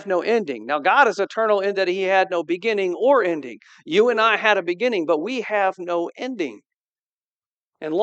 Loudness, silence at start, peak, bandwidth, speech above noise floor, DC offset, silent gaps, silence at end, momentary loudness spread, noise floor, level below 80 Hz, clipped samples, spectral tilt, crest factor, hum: -20 LUFS; 0 s; -2 dBFS; 8.4 kHz; over 70 dB; under 0.1%; 6.74-7.31 s, 7.46-7.72 s; 0 s; 11 LU; under -90 dBFS; -88 dBFS; under 0.1%; -4.5 dB/octave; 20 dB; none